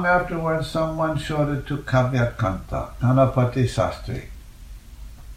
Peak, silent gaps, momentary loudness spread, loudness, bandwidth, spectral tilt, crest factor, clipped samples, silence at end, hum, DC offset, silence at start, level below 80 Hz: -4 dBFS; none; 14 LU; -23 LUFS; 14 kHz; -7 dB/octave; 18 dB; under 0.1%; 0 s; none; under 0.1%; 0 s; -38 dBFS